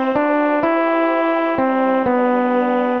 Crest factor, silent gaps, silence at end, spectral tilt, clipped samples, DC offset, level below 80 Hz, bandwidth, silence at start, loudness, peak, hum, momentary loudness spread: 12 dB; none; 0 s; -7.5 dB/octave; under 0.1%; 0.3%; -56 dBFS; 5.8 kHz; 0 s; -17 LUFS; -4 dBFS; none; 1 LU